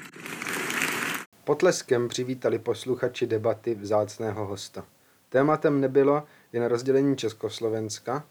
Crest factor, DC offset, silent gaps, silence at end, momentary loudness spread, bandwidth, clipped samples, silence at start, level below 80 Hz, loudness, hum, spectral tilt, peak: 18 dB; under 0.1%; 1.26-1.32 s; 0.1 s; 10 LU; over 20 kHz; under 0.1%; 0 s; -72 dBFS; -26 LUFS; none; -5 dB/octave; -8 dBFS